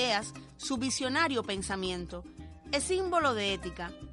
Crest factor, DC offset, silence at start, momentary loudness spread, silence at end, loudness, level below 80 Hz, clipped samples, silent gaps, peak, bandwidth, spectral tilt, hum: 18 dB; under 0.1%; 0 s; 15 LU; 0 s; -31 LUFS; -52 dBFS; under 0.1%; none; -16 dBFS; 11.5 kHz; -3 dB/octave; none